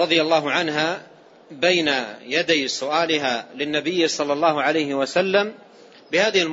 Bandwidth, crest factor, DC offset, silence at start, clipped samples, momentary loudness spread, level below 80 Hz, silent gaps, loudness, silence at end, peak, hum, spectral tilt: 8 kHz; 18 dB; under 0.1%; 0 s; under 0.1%; 7 LU; -70 dBFS; none; -21 LUFS; 0 s; -4 dBFS; none; -3 dB/octave